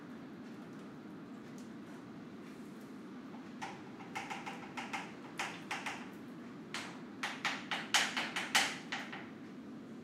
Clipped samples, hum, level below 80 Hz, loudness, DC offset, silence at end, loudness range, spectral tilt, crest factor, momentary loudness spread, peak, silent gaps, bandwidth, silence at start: under 0.1%; none; -84 dBFS; -41 LUFS; under 0.1%; 0 s; 13 LU; -2 dB/octave; 28 dB; 18 LU; -16 dBFS; none; 16 kHz; 0 s